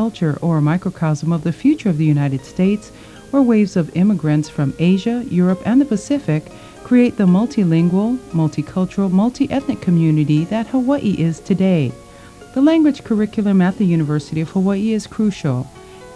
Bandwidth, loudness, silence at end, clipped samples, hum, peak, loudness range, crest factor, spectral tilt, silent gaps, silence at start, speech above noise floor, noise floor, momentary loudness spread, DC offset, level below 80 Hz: 11 kHz; -17 LUFS; 0 s; under 0.1%; none; -4 dBFS; 1 LU; 12 dB; -8 dB/octave; none; 0 s; 23 dB; -39 dBFS; 6 LU; under 0.1%; -48 dBFS